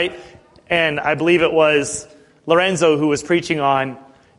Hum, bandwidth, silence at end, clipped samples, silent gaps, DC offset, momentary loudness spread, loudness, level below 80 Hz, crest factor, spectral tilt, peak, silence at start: none; 11.5 kHz; 0.4 s; under 0.1%; none; under 0.1%; 10 LU; -17 LUFS; -52 dBFS; 16 dB; -4.5 dB/octave; -2 dBFS; 0 s